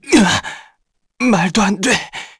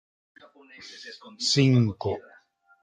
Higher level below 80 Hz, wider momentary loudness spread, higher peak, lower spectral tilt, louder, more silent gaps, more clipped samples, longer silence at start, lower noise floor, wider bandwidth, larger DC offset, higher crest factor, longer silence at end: first, -44 dBFS vs -66 dBFS; second, 12 LU vs 23 LU; first, 0 dBFS vs -8 dBFS; second, -4 dB/octave vs -5.5 dB/octave; first, -15 LUFS vs -24 LUFS; neither; neither; second, 0.05 s vs 0.8 s; first, -63 dBFS vs -59 dBFS; first, 11 kHz vs 9.6 kHz; neither; about the same, 16 dB vs 18 dB; second, 0.15 s vs 0.65 s